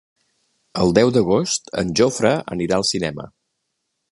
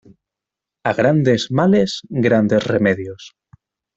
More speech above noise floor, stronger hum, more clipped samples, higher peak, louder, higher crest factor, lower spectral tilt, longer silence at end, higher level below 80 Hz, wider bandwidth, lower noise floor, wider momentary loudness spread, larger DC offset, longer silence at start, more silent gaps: second, 57 dB vs 69 dB; neither; neither; about the same, 0 dBFS vs -2 dBFS; about the same, -19 LUFS vs -17 LUFS; about the same, 20 dB vs 16 dB; second, -4.5 dB/octave vs -6.5 dB/octave; first, 0.85 s vs 0.7 s; first, -48 dBFS vs -54 dBFS; first, 11.5 kHz vs 8 kHz; second, -75 dBFS vs -85 dBFS; about the same, 12 LU vs 10 LU; neither; about the same, 0.75 s vs 0.85 s; neither